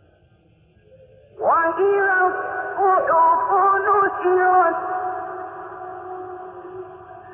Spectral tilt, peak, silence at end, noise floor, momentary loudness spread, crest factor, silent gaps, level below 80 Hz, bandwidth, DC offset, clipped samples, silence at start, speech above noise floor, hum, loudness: -9 dB/octave; -8 dBFS; 0 s; -56 dBFS; 20 LU; 14 dB; none; -60 dBFS; 3.4 kHz; under 0.1%; under 0.1%; 1.4 s; 38 dB; none; -18 LUFS